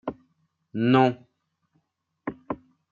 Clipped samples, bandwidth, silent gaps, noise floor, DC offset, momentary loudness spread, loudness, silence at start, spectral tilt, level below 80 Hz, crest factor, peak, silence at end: under 0.1%; 7 kHz; none; -75 dBFS; under 0.1%; 18 LU; -23 LUFS; 0.05 s; -8.5 dB/octave; -64 dBFS; 22 dB; -6 dBFS; 0.35 s